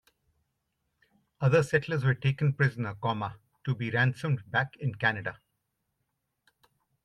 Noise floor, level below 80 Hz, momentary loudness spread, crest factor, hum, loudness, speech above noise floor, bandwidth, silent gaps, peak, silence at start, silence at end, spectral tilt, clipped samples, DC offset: -81 dBFS; -66 dBFS; 10 LU; 20 dB; none; -29 LUFS; 53 dB; 10.5 kHz; none; -10 dBFS; 1.4 s; 1.7 s; -7 dB/octave; under 0.1%; under 0.1%